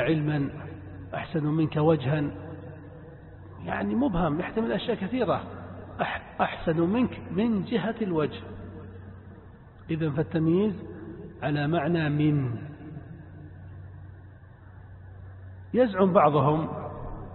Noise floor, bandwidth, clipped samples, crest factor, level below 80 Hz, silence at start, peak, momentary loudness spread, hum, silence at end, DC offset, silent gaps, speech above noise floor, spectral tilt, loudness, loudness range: -48 dBFS; 4.3 kHz; under 0.1%; 22 dB; -50 dBFS; 0 s; -6 dBFS; 22 LU; none; 0 s; under 0.1%; none; 23 dB; -11.5 dB/octave; -27 LUFS; 4 LU